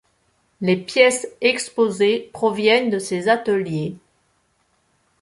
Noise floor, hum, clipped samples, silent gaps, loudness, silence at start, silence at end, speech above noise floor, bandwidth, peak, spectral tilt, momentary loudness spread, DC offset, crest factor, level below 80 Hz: -65 dBFS; none; under 0.1%; none; -19 LUFS; 0.6 s; 1.25 s; 46 dB; 11.5 kHz; -2 dBFS; -4 dB/octave; 8 LU; under 0.1%; 20 dB; -64 dBFS